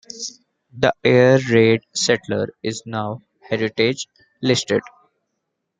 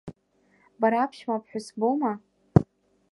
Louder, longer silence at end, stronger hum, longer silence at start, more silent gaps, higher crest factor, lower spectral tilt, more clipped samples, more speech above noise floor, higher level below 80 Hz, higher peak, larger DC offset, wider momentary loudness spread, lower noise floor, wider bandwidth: first, -19 LUFS vs -26 LUFS; first, 0.9 s vs 0.5 s; neither; about the same, 0.15 s vs 0.05 s; neither; second, 18 dB vs 26 dB; second, -4.5 dB/octave vs -8 dB/octave; neither; first, 58 dB vs 39 dB; second, -60 dBFS vs -48 dBFS; about the same, -2 dBFS vs -2 dBFS; neither; about the same, 16 LU vs 14 LU; first, -76 dBFS vs -66 dBFS; second, 9.6 kHz vs 11.5 kHz